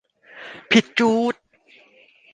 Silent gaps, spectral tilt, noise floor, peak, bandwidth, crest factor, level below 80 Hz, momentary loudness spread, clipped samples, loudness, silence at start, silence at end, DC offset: none; -4 dB/octave; -54 dBFS; -2 dBFS; 9.4 kHz; 20 dB; -64 dBFS; 21 LU; under 0.1%; -19 LUFS; 0.35 s; 1 s; under 0.1%